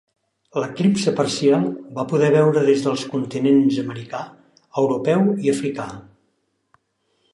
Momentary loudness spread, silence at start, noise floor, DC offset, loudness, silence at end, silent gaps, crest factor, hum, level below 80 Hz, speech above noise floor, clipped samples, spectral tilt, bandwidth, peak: 14 LU; 0.55 s; -69 dBFS; under 0.1%; -20 LUFS; 1.3 s; none; 16 dB; none; -64 dBFS; 50 dB; under 0.1%; -6.5 dB/octave; 11.5 kHz; -4 dBFS